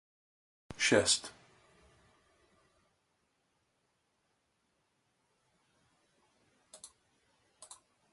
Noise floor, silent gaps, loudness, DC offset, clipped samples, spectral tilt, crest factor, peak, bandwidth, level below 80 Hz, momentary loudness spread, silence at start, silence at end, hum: -79 dBFS; none; -29 LUFS; under 0.1%; under 0.1%; -2 dB/octave; 30 dB; -12 dBFS; 11.5 kHz; -70 dBFS; 27 LU; 0.7 s; 1.25 s; none